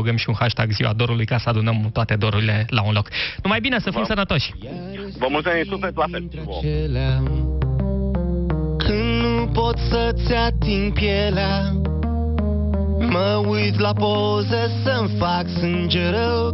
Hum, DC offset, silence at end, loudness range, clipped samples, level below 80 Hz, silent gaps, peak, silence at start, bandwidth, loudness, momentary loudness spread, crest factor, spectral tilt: none; under 0.1%; 0 s; 3 LU; under 0.1%; -28 dBFS; none; -2 dBFS; 0 s; 6 kHz; -21 LUFS; 4 LU; 18 dB; -5 dB/octave